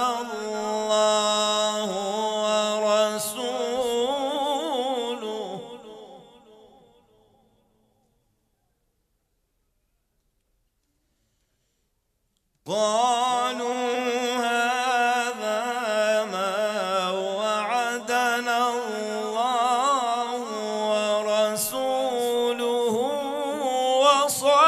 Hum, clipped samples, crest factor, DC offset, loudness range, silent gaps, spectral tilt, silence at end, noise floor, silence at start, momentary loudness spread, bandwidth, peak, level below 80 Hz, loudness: none; under 0.1%; 20 dB; under 0.1%; 7 LU; none; -2 dB/octave; 0 s; -73 dBFS; 0 s; 8 LU; 15.5 kHz; -4 dBFS; -72 dBFS; -24 LUFS